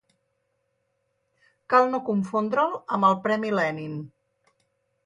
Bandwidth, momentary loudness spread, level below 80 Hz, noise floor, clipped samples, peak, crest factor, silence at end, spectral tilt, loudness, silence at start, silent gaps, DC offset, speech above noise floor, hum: 10.5 kHz; 14 LU; -74 dBFS; -74 dBFS; under 0.1%; -6 dBFS; 20 dB; 1 s; -7 dB/octave; -24 LUFS; 1.7 s; none; under 0.1%; 51 dB; none